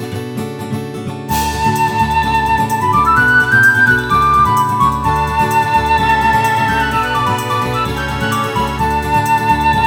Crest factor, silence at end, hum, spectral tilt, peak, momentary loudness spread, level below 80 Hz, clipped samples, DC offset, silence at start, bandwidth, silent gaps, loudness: 12 dB; 0 s; none; -4.5 dB/octave; 0 dBFS; 12 LU; -30 dBFS; under 0.1%; under 0.1%; 0 s; 19.5 kHz; none; -13 LUFS